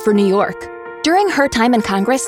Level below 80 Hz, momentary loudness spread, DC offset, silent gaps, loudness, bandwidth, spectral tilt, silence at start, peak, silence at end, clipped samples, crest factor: -46 dBFS; 9 LU; under 0.1%; none; -15 LUFS; 16.5 kHz; -4.5 dB/octave; 0 s; -2 dBFS; 0 s; under 0.1%; 14 dB